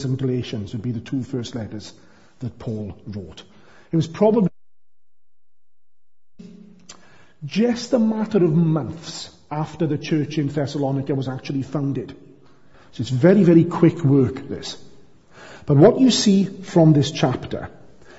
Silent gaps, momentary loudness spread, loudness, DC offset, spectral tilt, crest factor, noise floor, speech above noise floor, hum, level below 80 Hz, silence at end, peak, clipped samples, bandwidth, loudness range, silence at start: none; 19 LU; -20 LUFS; under 0.1%; -7 dB/octave; 20 dB; under -90 dBFS; over 71 dB; none; -54 dBFS; 0.3 s; -2 dBFS; under 0.1%; 8 kHz; 11 LU; 0 s